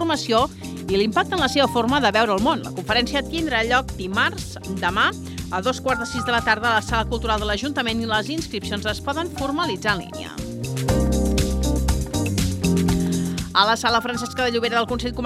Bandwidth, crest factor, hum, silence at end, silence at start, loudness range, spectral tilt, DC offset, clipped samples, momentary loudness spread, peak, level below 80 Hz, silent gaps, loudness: 15.5 kHz; 20 dB; none; 0 s; 0 s; 4 LU; -4.5 dB/octave; under 0.1%; under 0.1%; 7 LU; -2 dBFS; -32 dBFS; none; -21 LUFS